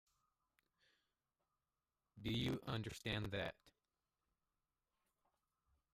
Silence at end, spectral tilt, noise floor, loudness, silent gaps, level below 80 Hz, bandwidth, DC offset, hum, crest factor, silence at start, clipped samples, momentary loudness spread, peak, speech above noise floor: 2.25 s; -5.5 dB/octave; under -90 dBFS; -45 LUFS; none; -68 dBFS; 15.5 kHz; under 0.1%; none; 20 dB; 2.15 s; under 0.1%; 6 LU; -30 dBFS; over 46 dB